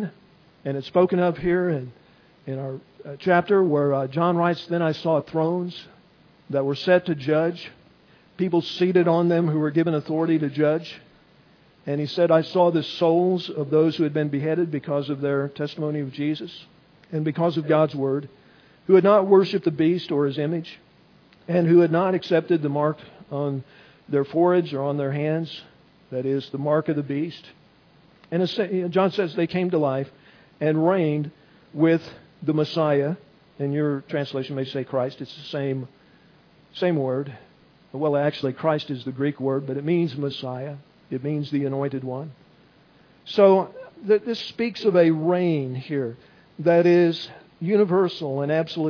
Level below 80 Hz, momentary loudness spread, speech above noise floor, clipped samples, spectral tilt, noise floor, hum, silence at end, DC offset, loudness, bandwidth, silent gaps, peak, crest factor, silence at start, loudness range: -64 dBFS; 15 LU; 33 dB; under 0.1%; -8.5 dB/octave; -55 dBFS; none; 0 s; under 0.1%; -23 LUFS; 5.4 kHz; none; -4 dBFS; 20 dB; 0 s; 6 LU